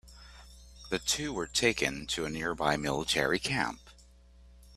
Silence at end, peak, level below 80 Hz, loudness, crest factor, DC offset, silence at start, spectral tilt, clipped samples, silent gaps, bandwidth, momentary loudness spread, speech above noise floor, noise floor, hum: 0 s; -10 dBFS; -52 dBFS; -30 LUFS; 22 dB; under 0.1%; 0.05 s; -3 dB/octave; under 0.1%; none; 15.5 kHz; 16 LU; 26 dB; -57 dBFS; none